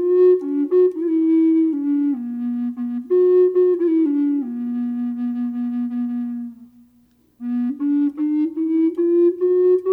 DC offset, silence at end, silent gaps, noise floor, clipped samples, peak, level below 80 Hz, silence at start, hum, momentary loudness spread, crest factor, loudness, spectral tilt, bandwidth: under 0.1%; 0 s; none; -57 dBFS; under 0.1%; -8 dBFS; -70 dBFS; 0 s; none; 10 LU; 10 dB; -19 LUFS; -9.5 dB/octave; 3.1 kHz